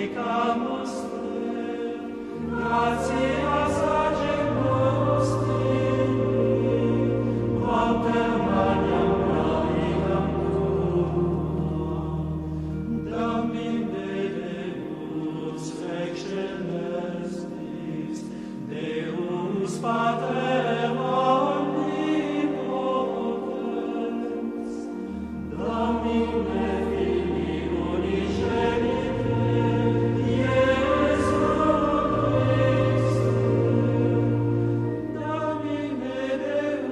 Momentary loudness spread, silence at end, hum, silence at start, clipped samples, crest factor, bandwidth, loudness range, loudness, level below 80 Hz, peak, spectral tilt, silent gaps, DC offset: 9 LU; 0 s; none; 0 s; under 0.1%; 16 dB; 11 kHz; 8 LU; -25 LUFS; -42 dBFS; -8 dBFS; -7.5 dB/octave; none; under 0.1%